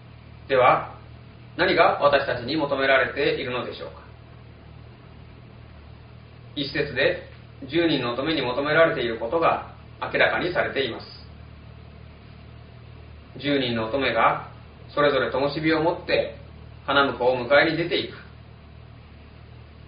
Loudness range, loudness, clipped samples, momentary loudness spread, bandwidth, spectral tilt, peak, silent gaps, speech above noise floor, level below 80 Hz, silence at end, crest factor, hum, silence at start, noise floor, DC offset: 9 LU; -23 LUFS; under 0.1%; 23 LU; 5.2 kHz; -2.5 dB/octave; -4 dBFS; none; 23 dB; -50 dBFS; 0.15 s; 22 dB; none; 0 s; -45 dBFS; under 0.1%